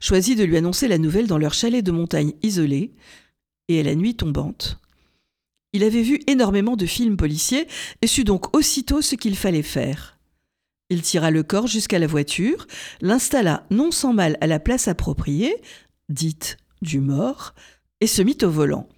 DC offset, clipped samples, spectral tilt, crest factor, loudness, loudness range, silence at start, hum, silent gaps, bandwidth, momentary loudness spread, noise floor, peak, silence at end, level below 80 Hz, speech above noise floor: under 0.1%; under 0.1%; -4.5 dB/octave; 18 dB; -20 LUFS; 4 LU; 0 s; none; none; 19.5 kHz; 10 LU; -79 dBFS; -4 dBFS; 0.15 s; -38 dBFS; 59 dB